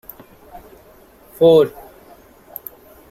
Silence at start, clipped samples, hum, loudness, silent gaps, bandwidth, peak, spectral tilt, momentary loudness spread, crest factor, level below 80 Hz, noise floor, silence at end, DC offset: 1.4 s; under 0.1%; none; -14 LUFS; none; 16 kHz; -2 dBFS; -7 dB/octave; 25 LU; 18 dB; -54 dBFS; -47 dBFS; 1.4 s; under 0.1%